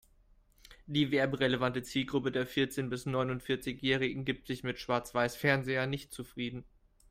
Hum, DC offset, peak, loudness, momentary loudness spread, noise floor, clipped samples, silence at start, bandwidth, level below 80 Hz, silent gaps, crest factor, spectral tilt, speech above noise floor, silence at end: none; under 0.1%; -14 dBFS; -33 LUFS; 10 LU; -65 dBFS; under 0.1%; 0.7 s; 16 kHz; -60 dBFS; none; 20 dB; -5.5 dB/octave; 32 dB; 0.5 s